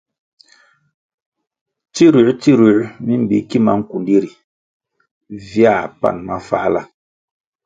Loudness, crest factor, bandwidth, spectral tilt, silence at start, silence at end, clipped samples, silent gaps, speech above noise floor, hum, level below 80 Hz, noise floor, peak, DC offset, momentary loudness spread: -15 LUFS; 16 dB; 7.8 kHz; -7 dB/octave; 1.95 s; 0.8 s; under 0.1%; 4.44-4.80 s, 5.11-5.21 s; 39 dB; none; -54 dBFS; -53 dBFS; 0 dBFS; under 0.1%; 13 LU